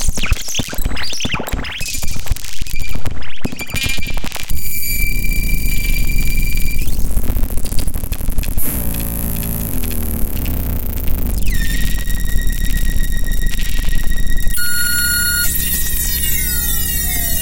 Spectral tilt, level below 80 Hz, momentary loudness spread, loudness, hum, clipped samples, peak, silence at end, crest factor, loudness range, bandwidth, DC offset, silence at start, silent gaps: -3 dB/octave; -18 dBFS; 8 LU; -20 LUFS; none; under 0.1%; -2 dBFS; 0 s; 12 dB; 6 LU; 17.5 kHz; under 0.1%; 0 s; none